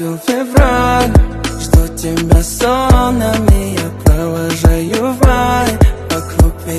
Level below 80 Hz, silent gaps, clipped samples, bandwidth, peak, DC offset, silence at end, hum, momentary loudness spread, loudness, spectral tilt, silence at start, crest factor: -16 dBFS; none; 0.2%; 14 kHz; 0 dBFS; under 0.1%; 0 s; none; 7 LU; -13 LUFS; -6 dB/octave; 0 s; 12 dB